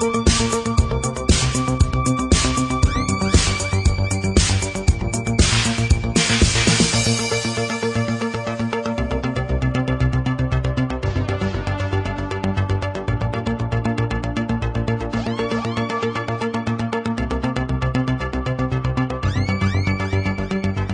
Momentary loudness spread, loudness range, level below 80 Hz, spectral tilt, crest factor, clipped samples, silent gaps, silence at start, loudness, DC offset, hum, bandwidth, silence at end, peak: 6 LU; 5 LU; -28 dBFS; -4.5 dB/octave; 16 dB; under 0.1%; none; 0 s; -20 LUFS; under 0.1%; none; 11 kHz; 0 s; -2 dBFS